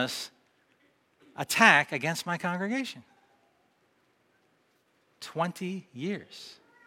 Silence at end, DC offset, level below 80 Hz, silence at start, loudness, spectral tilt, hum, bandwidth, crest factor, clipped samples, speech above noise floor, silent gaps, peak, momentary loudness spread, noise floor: 0.35 s; under 0.1%; -80 dBFS; 0 s; -27 LUFS; -3.5 dB/octave; none; 16 kHz; 28 dB; under 0.1%; 41 dB; none; -4 dBFS; 26 LU; -70 dBFS